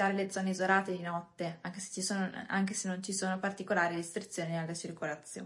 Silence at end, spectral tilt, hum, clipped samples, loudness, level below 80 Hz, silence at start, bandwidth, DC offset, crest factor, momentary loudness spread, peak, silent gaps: 0 s; -4 dB/octave; none; under 0.1%; -35 LUFS; -80 dBFS; 0 s; 11.5 kHz; under 0.1%; 20 dB; 10 LU; -14 dBFS; none